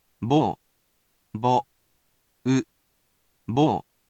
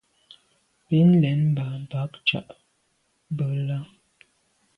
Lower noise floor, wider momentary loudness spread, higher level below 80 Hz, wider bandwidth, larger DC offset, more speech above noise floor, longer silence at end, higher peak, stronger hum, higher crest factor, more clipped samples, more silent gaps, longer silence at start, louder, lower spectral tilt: about the same, -69 dBFS vs -70 dBFS; first, 18 LU vs 15 LU; about the same, -62 dBFS vs -64 dBFS; first, 8.4 kHz vs 5 kHz; neither; about the same, 47 dB vs 47 dB; second, 0.3 s vs 0.9 s; about the same, -8 dBFS vs -8 dBFS; neither; about the same, 18 dB vs 16 dB; neither; neither; second, 0.2 s vs 0.9 s; about the same, -24 LUFS vs -24 LUFS; second, -7 dB/octave vs -8.5 dB/octave